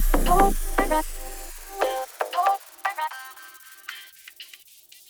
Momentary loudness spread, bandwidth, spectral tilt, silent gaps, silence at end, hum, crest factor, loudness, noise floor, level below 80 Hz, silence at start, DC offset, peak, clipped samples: 22 LU; over 20 kHz; -4 dB/octave; none; 0.65 s; none; 20 dB; -25 LUFS; -51 dBFS; -30 dBFS; 0 s; under 0.1%; -6 dBFS; under 0.1%